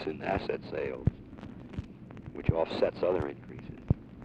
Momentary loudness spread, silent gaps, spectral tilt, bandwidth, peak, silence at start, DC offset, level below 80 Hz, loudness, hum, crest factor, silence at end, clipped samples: 17 LU; none; -9 dB/octave; 8.4 kHz; -12 dBFS; 0 s; under 0.1%; -46 dBFS; -33 LUFS; none; 22 dB; 0 s; under 0.1%